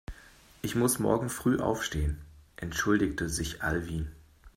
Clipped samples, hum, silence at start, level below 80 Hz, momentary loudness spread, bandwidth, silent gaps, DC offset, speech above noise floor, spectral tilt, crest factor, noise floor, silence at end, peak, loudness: under 0.1%; none; 0.1 s; -42 dBFS; 13 LU; 16 kHz; none; under 0.1%; 26 dB; -5 dB/octave; 20 dB; -56 dBFS; 0.05 s; -12 dBFS; -30 LUFS